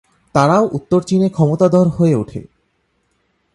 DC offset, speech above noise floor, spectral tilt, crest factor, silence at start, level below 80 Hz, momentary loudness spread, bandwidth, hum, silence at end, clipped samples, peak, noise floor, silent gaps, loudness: under 0.1%; 51 dB; -8 dB/octave; 16 dB; 0.35 s; -48 dBFS; 7 LU; 11.5 kHz; none; 1.1 s; under 0.1%; 0 dBFS; -65 dBFS; none; -15 LUFS